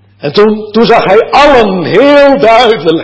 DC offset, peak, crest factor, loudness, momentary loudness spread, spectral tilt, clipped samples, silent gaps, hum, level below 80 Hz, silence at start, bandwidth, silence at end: under 0.1%; 0 dBFS; 6 dB; -6 LUFS; 4 LU; -5.5 dB/octave; 6%; none; none; -36 dBFS; 0.25 s; 8 kHz; 0 s